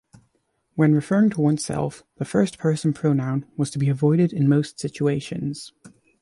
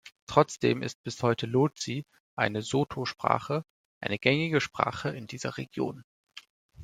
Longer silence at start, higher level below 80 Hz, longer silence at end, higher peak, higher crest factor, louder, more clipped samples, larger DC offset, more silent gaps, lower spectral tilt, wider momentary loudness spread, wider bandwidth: first, 0.75 s vs 0.05 s; first, -58 dBFS vs -64 dBFS; first, 0.35 s vs 0 s; about the same, -6 dBFS vs -4 dBFS; second, 16 dB vs 26 dB; first, -22 LUFS vs -29 LUFS; neither; neither; second, none vs 0.22-0.27 s, 0.95-1.04 s, 2.20-2.37 s, 3.70-4.01 s, 6.04-6.24 s, 6.50-6.69 s; first, -7 dB/octave vs -5.5 dB/octave; about the same, 11 LU vs 13 LU; second, 11.5 kHz vs 14 kHz